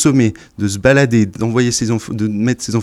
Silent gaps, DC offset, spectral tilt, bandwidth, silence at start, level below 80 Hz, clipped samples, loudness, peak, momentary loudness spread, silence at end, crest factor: none; under 0.1%; -5.5 dB/octave; 13 kHz; 0 s; -42 dBFS; under 0.1%; -15 LUFS; 0 dBFS; 8 LU; 0 s; 14 dB